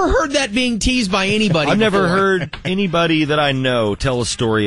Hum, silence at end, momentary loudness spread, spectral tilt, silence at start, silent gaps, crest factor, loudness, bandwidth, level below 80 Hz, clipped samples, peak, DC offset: none; 0 s; 4 LU; -4.5 dB/octave; 0 s; none; 12 dB; -16 LUFS; 11.5 kHz; -34 dBFS; under 0.1%; -4 dBFS; 0.5%